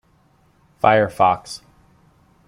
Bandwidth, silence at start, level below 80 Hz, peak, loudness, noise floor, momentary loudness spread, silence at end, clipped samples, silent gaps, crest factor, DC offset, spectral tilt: 15.5 kHz; 0.85 s; -56 dBFS; -2 dBFS; -18 LUFS; -58 dBFS; 20 LU; 0.9 s; under 0.1%; none; 20 dB; under 0.1%; -5.5 dB/octave